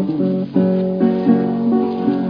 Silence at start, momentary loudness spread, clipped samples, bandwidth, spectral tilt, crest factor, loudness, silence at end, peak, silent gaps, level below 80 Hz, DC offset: 0 s; 3 LU; under 0.1%; 5.2 kHz; -11 dB/octave; 14 dB; -17 LUFS; 0 s; -2 dBFS; none; -54 dBFS; under 0.1%